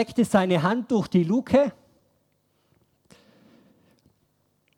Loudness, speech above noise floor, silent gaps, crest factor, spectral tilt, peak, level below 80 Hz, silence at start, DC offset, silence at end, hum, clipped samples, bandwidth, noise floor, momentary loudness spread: -23 LUFS; 47 dB; none; 20 dB; -7 dB/octave; -6 dBFS; -60 dBFS; 0 s; under 0.1%; 3.05 s; none; under 0.1%; 14 kHz; -69 dBFS; 3 LU